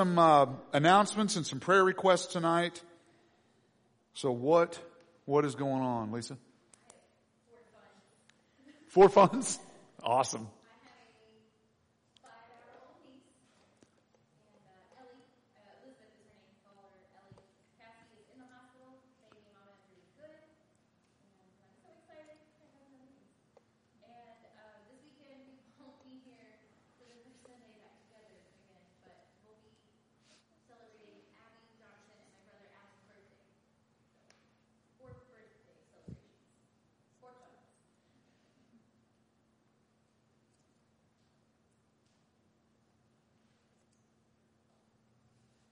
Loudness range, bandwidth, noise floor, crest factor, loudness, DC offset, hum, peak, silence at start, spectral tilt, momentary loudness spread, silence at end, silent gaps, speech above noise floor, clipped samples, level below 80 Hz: 10 LU; 10.5 kHz; -73 dBFS; 26 dB; -28 LUFS; under 0.1%; none; -12 dBFS; 0 s; -5 dB/octave; 25 LU; 9.6 s; none; 46 dB; under 0.1%; -74 dBFS